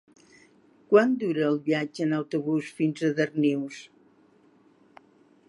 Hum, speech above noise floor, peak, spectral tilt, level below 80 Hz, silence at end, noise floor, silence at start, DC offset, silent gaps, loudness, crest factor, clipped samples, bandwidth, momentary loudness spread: none; 35 dB; -6 dBFS; -7 dB/octave; -80 dBFS; 1.65 s; -60 dBFS; 0.9 s; under 0.1%; none; -26 LUFS; 20 dB; under 0.1%; 11.5 kHz; 8 LU